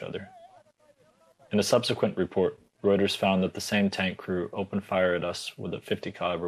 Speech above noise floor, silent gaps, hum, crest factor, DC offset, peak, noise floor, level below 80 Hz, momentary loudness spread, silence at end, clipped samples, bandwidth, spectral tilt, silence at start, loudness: 35 dB; none; none; 18 dB; under 0.1%; -10 dBFS; -63 dBFS; -68 dBFS; 10 LU; 0 s; under 0.1%; 13.5 kHz; -5 dB/octave; 0 s; -28 LUFS